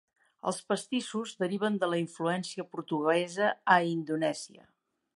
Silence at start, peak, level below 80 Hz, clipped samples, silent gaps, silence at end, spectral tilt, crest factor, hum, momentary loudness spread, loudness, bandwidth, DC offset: 0.45 s; -8 dBFS; -82 dBFS; under 0.1%; none; 0.65 s; -5 dB/octave; 22 dB; none; 12 LU; -31 LUFS; 11.5 kHz; under 0.1%